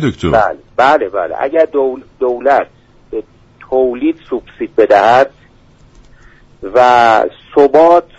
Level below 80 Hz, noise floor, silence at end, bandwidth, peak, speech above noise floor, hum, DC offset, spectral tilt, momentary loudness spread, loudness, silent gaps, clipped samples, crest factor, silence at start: -42 dBFS; -44 dBFS; 0.15 s; 8 kHz; 0 dBFS; 33 dB; none; under 0.1%; -6 dB/octave; 15 LU; -12 LUFS; none; under 0.1%; 12 dB; 0 s